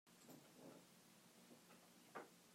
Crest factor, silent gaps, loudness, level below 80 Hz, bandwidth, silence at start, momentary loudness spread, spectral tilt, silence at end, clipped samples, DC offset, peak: 24 dB; none; -64 LUFS; under -90 dBFS; 16 kHz; 0.05 s; 8 LU; -3.5 dB/octave; 0 s; under 0.1%; under 0.1%; -42 dBFS